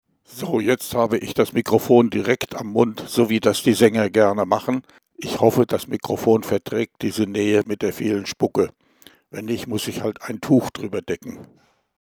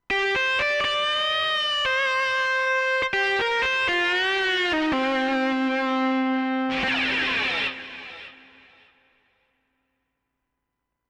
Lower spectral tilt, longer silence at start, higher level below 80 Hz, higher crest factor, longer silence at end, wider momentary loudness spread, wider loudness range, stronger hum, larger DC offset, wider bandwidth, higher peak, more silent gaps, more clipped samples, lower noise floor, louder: first, -5.5 dB/octave vs -2.5 dB/octave; first, 0.3 s vs 0.1 s; about the same, -58 dBFS vs -56 dBFS; first, 20 dB vs 10 dB; second, 0.6 s vs 2.75 s; first, 12 LU vs 4 LU; about the same, 6 LU vs 6 LU; neither; neither; first, over 20 kHz vs 11 kHz; first, 0 dBFS vs -16 dBFS; neither; neither; second, -52 dBFS vs -81 dBFS; about the same, -21 LUFS vs -22 LUFS